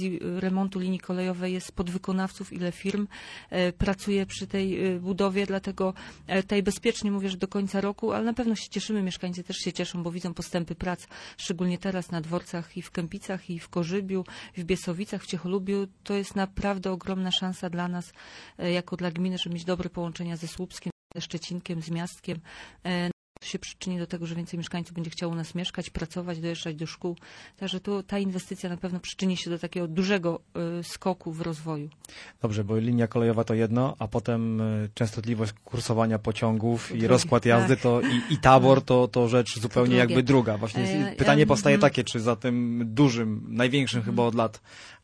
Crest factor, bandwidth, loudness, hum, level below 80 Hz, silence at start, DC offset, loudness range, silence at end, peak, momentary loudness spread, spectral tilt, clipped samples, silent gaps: 26 dB; 11 kHz; -27 LUFS; none; -52 dBFS; 0 s; under 0.1%; 12 LU; 0.05 s; -2 dBFS; 14 LU; -6 dB/octave; under 0.1%; 20.92-21.10 s, 23.13-23.35 s